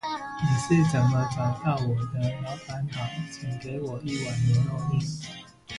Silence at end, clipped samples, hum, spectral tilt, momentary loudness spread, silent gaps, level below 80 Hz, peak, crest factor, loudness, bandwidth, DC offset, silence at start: 0 s; under 0.1%; none; -6.5 dB/octave; 12 LU; none; -52 dBFS; -10 dBFS; 16 dB; -27 LUFS; 11.5 kHz; under 0.1%; 0.05 s